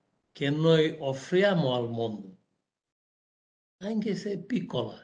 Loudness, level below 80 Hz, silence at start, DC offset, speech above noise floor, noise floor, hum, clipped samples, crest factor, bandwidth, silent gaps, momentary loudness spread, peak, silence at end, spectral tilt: -28 LUFS; -72 dBFS; 0.35 s; under 0.1%; 53 dB; -81 dBFS; none; under 0.1%; 20 dB; 9.4 kHz; 2.92-3.79 s; 11 LU; -10 dBFS; 0.05 s; -6.5 dB/octave